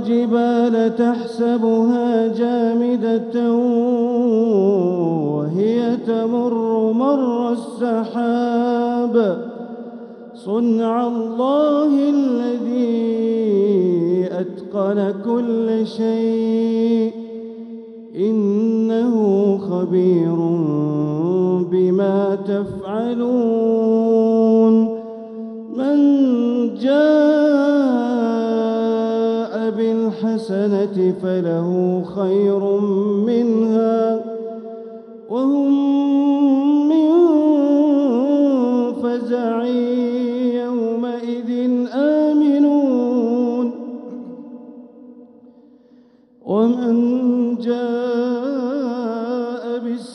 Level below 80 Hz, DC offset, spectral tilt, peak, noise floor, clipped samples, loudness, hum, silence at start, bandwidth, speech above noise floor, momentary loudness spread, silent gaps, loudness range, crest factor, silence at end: -68 dBFS; under 0.1%; -8.5 dB/octave; -4 dBFS; -50 dBFS; under 0.1%; -18 LUFS; none; 0 s; 6.4 kHz; 33 dB; 10 LU; none; 4 LU; 14 dB; 0 s